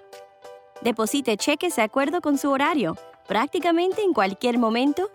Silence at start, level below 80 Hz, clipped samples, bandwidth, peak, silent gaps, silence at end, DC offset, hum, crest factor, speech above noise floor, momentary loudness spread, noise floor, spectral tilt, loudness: 0.15 s; -68 dBFS; under 0.1%; 17.5 kHz; -8 dBFS; none; 0.05 s; under 0.1%; none; 16 dB; 24 dB; 5 LU; -46 dBFS; -4 dB/octave; -23 LUFS